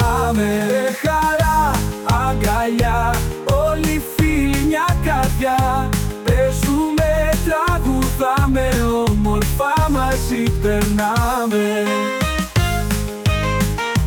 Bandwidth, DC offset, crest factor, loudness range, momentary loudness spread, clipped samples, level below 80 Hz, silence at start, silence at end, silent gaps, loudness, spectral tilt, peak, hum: 19 kHz; under 0.1%; 12 dB; 1 LU; 3 LU; under 0.1%; -24 dBFS; 0 s; 0 s; none; -18 LUFS; -5.5 dB/octave; -6 dBFS; none